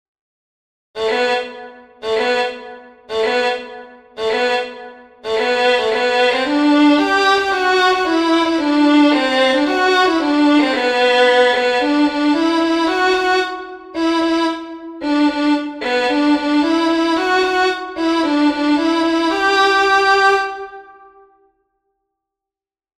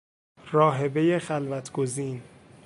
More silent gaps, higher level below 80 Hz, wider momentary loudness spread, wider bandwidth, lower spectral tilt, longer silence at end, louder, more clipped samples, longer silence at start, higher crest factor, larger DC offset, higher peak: neither; first, -52 dBFS vs -68 dBFS; about the same, 12 LU vs 10 LU; about the same, 11.5 kHz vs 11.5 kHz; second, -2.5 dB/octave vs -6.5 dB/octave; first, 2.15 s vs 0.1 s; first, -15 LUFS vs -26 LUFS; neither; first, 0.95 s vs 0.45 s; second, 14 dB vs 20 dB; neither; first, -2 dBFS vs -6 dBFS